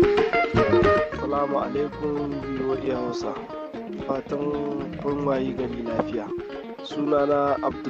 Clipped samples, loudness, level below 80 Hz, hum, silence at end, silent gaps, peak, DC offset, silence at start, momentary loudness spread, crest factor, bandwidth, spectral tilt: under 0.1%; -25 LUFS; -46 dBFS; none; 0 s; none; -6 dBFS; under 0.1%; 0 s; 13 LU; 18 dB; 7.8 kHz; -7 dB/octave